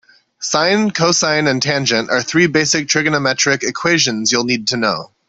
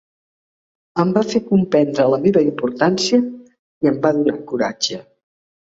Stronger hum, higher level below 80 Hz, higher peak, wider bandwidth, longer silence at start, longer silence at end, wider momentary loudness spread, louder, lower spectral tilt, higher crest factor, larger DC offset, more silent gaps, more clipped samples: neither; about the same, -56 dBFS vs -58 dBFS; about the same, -2 dBFS vs -2 dBFS; about the same, 8.4 kHz vs 8 kHz; second, 0.4 s vs 0.95 s; second, 0.25 s vs 0.75 s; second, 4 LU vs 7 LU; first, -15 LUFS vs -18 LUFS; second, -3 dB/octave vs -5.5 dB/octave; about the same, 14 dB vs 16 dB; neither; second, none vs 3.59-3.81 s; neither